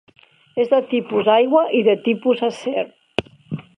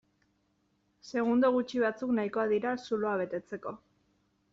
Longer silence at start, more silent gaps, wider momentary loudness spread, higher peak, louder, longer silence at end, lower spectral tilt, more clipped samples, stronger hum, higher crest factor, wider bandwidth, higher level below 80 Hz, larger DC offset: second, 0.55 s vs 1.05 s; neither; about the same, 12 LU vs 14 LU; first, 0 dBFS vs -16 dBFS; first, -19 LUFS vs -31 LUFS; second, 0.15 s vs 0.75 s; first, -6.5 dB/octave vs -4.5 dB/octave; neither; second, none vs 50 Hz at -60 dBFS; about the same, 18 dB vs 16 dB; first, 10 kHz vs 7.6 kHz; first, -58 dBFS vs -74 dBFS; neither